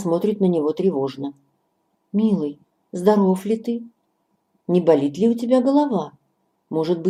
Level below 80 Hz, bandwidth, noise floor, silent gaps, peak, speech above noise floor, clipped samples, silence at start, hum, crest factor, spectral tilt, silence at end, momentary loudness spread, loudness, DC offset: -70 dBFS; 13.5 kHz; -69 dBFS; none; -2 dBFS; 50 dB; under 0.1%; 0 s; none; 18 dB; -8 dB/octave; 0 s; 13 LU; -20 LUFS; under 0.1%